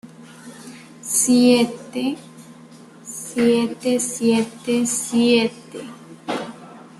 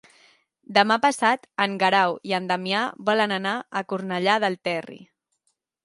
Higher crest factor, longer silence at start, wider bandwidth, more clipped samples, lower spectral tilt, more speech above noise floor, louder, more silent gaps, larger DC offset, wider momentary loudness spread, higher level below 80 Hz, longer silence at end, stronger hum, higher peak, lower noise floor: about the same, 18 dB vs 22 dB; second, 0.05 s vs 0.7 s; first, 13 kHz vs 11.5 kHz; neither; about the same, -3.5 dB/octave vs -4 dB/octave; second, 25 dB vs 51 dB; first, -19 LUFS vs -23 LUFS; neither; neither; first, 24 LU vs 9 LU; first, -64 dBFS vs -76 dBFS; second, 0.15 s vs 0.8 s; neither; about the same, -4 dBFS vs -2 dBFS; second, -44 dBFS vs -74 dBFS